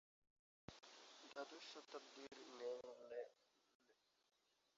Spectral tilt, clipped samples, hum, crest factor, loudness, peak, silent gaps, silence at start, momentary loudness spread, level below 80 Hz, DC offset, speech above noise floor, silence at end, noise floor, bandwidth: -2 dB/octave; under 0.1%; none; 20 dB; -57 LUFS; -38 dBFS; 3.75-3.80 s; 0.7 s; 11 LU; -88 dBFS; under 0.1%; 25 dB; 0.85 s; -81 dBFS; 7.6 kHz